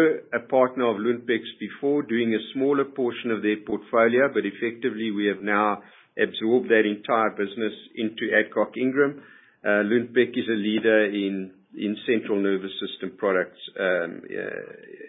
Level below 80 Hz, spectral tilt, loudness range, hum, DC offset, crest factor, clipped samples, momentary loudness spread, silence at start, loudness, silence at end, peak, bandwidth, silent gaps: -72 dBFS; -10 dB/octave; 2 LU; none; under 0.1%; 18 dB; under 0.1%; 11 LU; 0 s; -24 LUFS; 0 s; -6 dBFS; 4 kHz; none